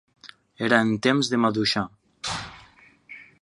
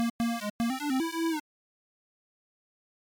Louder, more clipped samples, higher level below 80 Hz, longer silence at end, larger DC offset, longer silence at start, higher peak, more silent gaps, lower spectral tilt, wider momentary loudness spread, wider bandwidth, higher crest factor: first, -23 LUFS vs -31 LUFS; neither; first, -58 dBFS vs -66 dBFS; second, 0.2 s vs 1.8 s; neither; first, 0.25 s vs 0 s; first, -2 dBFS vs -24 dBFS; second, none vs 0.10-0.19 s, 0.50-0.59 s; about the same, -4.5 dB/octave vs -4 dB/octave; first, 22 LU vs 3 LU; second, 11.5 kHz vs 19.5 kHz; first, 24 dB vs 8 dB